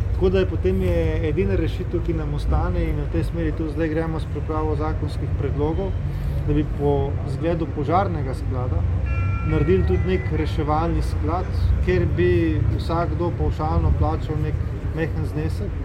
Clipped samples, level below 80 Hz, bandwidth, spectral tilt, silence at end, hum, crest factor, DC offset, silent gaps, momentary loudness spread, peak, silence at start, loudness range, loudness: under 0.1%; -26 dBFS; 9.4 kHz; -9 dB/octave; 0 s; none; 14 dB; under 0.1%; none; 6 LU; -8 dBFS; 0 s; 3 LU; -23 LUFS